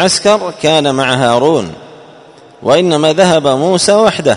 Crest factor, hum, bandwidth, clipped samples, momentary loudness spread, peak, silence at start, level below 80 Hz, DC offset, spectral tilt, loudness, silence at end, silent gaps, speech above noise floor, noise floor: 10 dB; none; 11 kHz; 0.3%; 4 LU; 0 dBFS; 0 s; -48 dBFS; under 0.1%; -4 dB/octave; -10 LUFS; 0 s; none; 28 dB; -38 dBFS